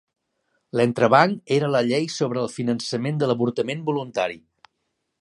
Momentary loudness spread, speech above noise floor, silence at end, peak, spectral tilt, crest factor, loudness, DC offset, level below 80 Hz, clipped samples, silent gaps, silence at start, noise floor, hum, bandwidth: 10 LU; 55 dB; 0.8 s; 0 dBFS; -6 dB/octave; 22 dB; -22 LUFS; under 0.1%; -68 dBFS; under 0.1%; none; 0.75 s; -76 dBFS; none; 11.5 kHz